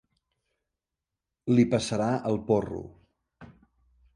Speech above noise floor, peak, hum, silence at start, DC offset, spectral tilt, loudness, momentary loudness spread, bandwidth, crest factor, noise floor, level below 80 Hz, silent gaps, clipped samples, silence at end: 62 dB; -10 dBFS; none; 1.45 s; under 0.1%; -6.5 dB/octave; -26 LUFS; 16 LU; 11 kHz; 20 dB; -88 dBFS; -58 dBFS; none; under 0.1%; 0.65 s